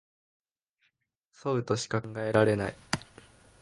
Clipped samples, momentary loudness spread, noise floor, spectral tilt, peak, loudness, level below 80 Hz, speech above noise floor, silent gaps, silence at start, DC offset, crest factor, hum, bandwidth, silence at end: under 0.1%; 10 LU; -76 dBFS; -5.5 dB/octave; -8 dBFS; -30 LUFS; -60 dBFS; 48 dB; none; 1.45 s; under 0.1%; 24 dB; none; 11.5 kHz; 0.55 s